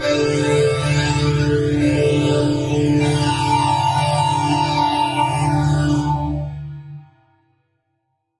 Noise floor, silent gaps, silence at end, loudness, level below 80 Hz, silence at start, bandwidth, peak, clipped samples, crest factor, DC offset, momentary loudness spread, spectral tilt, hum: -71 dBFS; none; 1.35 s; -18 LUFS; -38 dBFS; 0 s; 11.5 kHz; -6 dBFS; under 0.1%; 12 dB; under 0.1%; 6 LU; -6 dB/octave; none